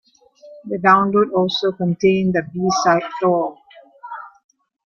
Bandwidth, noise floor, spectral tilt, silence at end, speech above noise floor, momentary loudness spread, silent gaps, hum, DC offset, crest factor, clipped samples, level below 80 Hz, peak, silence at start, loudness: 7 kHz; -46 dBFS; -5.5 dB/octave; 0.6 s; 29 dB; 20 LU; none; none; under 0.1%; 18 dB; under 0.1%; -58 dBFS; -2 dBFS; 0.45 s; -18 LUFS